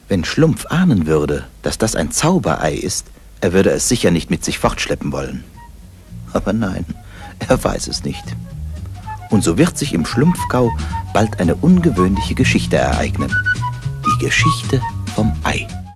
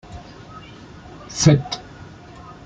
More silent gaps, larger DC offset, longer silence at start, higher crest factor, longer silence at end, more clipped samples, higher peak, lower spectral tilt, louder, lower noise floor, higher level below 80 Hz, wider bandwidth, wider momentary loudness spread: neither; neither; about the same, 0.05 s vs 0.1 s; second, 16 dB vs 22 dB; about the same, 0 s vs 0.1 s; neither; about the same, 0 dBFS vs -2 dBFS; about the same, -5 dB/octave vs -5 dB/octave; about the same, -17 LUFS vs -19 LUFS; about the same, -38 dBFS vs -41 dBFS; first, -30 dBFS vs -48 dBFS; first, 14 kHz vs 8.8 kHz; second, 14 LU vs 25 LU